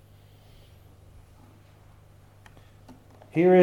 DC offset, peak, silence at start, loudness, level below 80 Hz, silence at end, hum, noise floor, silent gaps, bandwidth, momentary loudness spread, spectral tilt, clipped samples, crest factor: under 0.1%; -6 dBFS; 3.35 s; -23 LUFS; -60 dBFS; 0 s; 50 Hz at -55 dBFS; -54 dBFS; none; 4.6 kHz; 31 LU; -9 dB/octave; under 0.1%; 22 dB